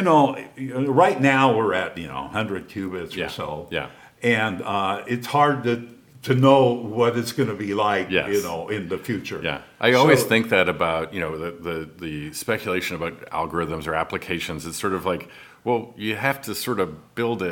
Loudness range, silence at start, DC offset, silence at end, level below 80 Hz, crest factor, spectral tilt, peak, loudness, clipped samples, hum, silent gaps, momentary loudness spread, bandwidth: 6 LU; 0 s; under 0.1%; 0 s; -54 dBFS; 22 dB; -5.5 dB/octave; 0 dBFS; -23 LUFS; under 0.1%; none; none; 13 LU; 18.5 kHz